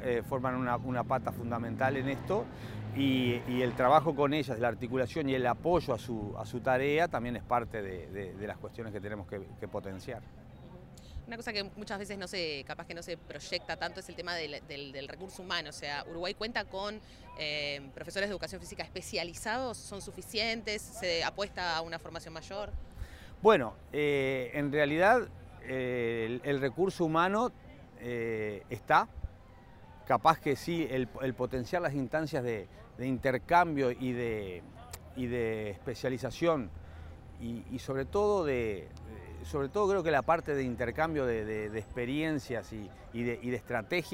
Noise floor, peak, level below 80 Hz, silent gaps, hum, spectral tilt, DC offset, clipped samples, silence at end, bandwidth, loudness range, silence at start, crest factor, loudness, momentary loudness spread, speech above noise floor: -53 dBFS; -10 dBFS; -54 dBFS; none; none; -5.5 dB/octave; under 0.1%; under 0.1%; 0 s; 16 kHz; 8 LU; 0 s; 24 dB; -33 LUFS; 16 LU; 21 dB